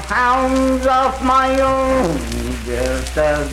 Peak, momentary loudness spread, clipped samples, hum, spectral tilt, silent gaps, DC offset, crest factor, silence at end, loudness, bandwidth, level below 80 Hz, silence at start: -4 dBFS; 8 LU; under 0.1%; none; -5 dB/octave; none; under 0.1%; 12 dB; 0 s; -16 LUFS; 16 kHz; -28 dBFS; 0 s